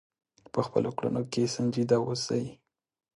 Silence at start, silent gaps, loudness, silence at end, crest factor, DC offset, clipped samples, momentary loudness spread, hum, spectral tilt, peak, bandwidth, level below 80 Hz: 0.55 s; none; -29 LUFS; 0.6 s; 20 dB; under 0.1%; under 0.1%; 6 LU; none; -6 dB/octave; -10 dBFS; 11 kHz; -66 dBFS